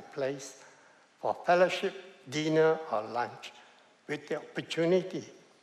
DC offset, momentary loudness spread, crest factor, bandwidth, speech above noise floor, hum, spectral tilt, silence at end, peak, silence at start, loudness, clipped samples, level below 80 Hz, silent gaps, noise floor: under 0.1%; 18 LU; 20 dB; 12.5 kHz; 30 dB; none; -5 dB/octave; 0.25 s; -12 dBFS; 0 s; -31 LUFS; under 0.1%; -84 dBFS; none; -60 dBFS